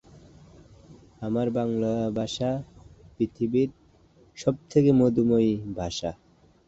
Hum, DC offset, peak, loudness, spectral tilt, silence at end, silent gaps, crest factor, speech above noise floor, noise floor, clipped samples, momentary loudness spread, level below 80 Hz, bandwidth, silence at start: none; under 0.1%; -8 dBFS; -26 LUFS; -7 dB/octave; 0.55 s; none; 18 dB; 33 dB; -58 dBFS; under 0.1%; 11 LU; -54 dBFS; 8 kHz; 0.15 s